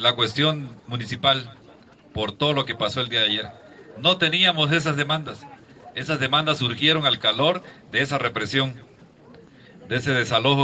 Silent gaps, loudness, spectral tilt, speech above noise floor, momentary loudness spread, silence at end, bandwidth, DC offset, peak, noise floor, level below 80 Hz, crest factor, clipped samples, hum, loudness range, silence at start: none; -22 LUFS; -4.5 dB/octave; 27 dB; 14 LU; 0 s; 8.6 kHz; under 0.1%; -4 dBFS; -50 dBFS; -60 dBFS; 20 dB; under 0.1%; none; 3 LU; 0 s